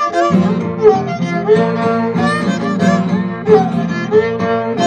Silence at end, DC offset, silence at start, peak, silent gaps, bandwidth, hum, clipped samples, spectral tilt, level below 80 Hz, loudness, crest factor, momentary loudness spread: 0 s; under 0.1%; 0 s; 0 dBFS; none; 9.4 kHz; none; under 0.1%; -7 dB/octave; -52 dBFS; -14 LUFS; 14 dB; 5 LU